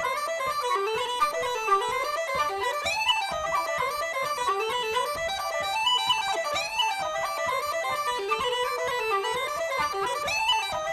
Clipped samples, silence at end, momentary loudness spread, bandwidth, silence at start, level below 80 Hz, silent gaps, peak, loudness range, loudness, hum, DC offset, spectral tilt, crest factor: under 0.1%; 0 s; 5 LU; 16.5 kHz; 0 s; -58 dBFS; none; -12 dBFS; 1 LU; -26 LUFS; none; under 0.1%; -0.5 dB/octave; 16 dB